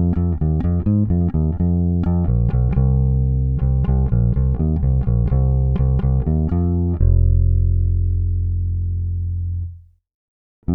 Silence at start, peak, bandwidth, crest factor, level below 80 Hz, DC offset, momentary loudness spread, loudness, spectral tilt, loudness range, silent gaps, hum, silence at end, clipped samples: 0 s; -6 dBFS; 2.5 kHz; 12 dB; -22 dBFS; under 0.1%; 6 LU; -19 LUFS; -14 dB/octave; 2 LU; 10.14-10.62 s; none; 0 s; under 0.1%